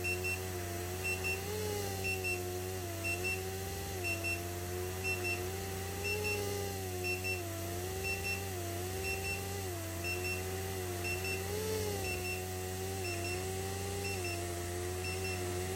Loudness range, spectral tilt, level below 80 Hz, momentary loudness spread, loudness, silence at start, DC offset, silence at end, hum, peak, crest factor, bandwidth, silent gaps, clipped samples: 1 LU; -4 dB/octave; -58 dBFS; 5 LU; -37 LUFS; 0 s; under 0.1%; 0 s; none; -24 dBFS; 14 dB; 16.5 kHz; none; under 0.1%